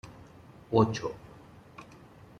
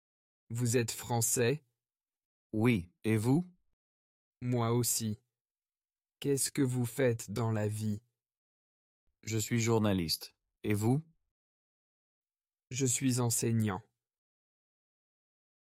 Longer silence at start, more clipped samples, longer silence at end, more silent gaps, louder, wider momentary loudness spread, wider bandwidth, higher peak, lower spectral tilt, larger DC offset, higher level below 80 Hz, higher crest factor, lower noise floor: second, 0.05 s vs 0.5 s; neither; second, 0.55 s vs 1.95 s; second, none vs 2.25-2.50 s, 3.73-4.32 s, 5.41-5.45 s, 8.37-9.07 s, 11.31-12.22 s; first, -29 LUFS vs -32 LUFS; first, 26 LU vs 12 LU; second, 10 kHz vs 16 kHz; first, -10 dBFS vs -16 dBFS; first, -7 dB/octave vs -5 dB/octave; neither; first, -60 dBFS vs -68 dBFS; first, 24 dB vs 18 dB; second, -53 dBFS vs under -90 dBFS